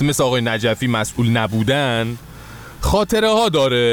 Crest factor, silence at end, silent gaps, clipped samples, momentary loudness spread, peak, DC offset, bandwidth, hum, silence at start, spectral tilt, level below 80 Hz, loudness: 14 dB; 0 s; none; under 0.1%; 14 LU; -4 dBFS; under 0.1%; over 20 kHz; none; 0 s; -5 dB/octave; -34 dBFS; -17 LUFS